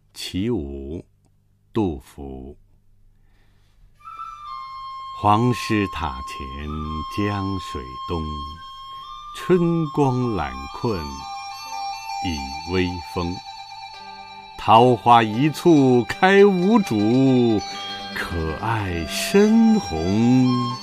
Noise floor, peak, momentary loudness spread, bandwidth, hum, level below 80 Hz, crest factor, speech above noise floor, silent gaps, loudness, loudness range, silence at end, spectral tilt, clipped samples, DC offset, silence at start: -59 dBFS; -2 dBFS; 21 LU; 15.5 kHz; 50 Hz at -50 dBFS; -42 dBFS; 20 dB; 40 dB; none; -20 LUFS; 14 LU; 0 s; -6 dB/octave; under 0.1%; under 0.1%; 0.15 s